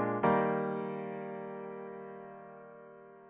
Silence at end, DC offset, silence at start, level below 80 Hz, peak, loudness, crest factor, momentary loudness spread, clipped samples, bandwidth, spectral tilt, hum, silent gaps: 0 s; under 0.1%; 0 s; -72 dBFS; -16 dBFS; -35 LUFS; 20 dB; 23 LU; under 0.1%; 4 kHz; -6.5 dB/octave; none; none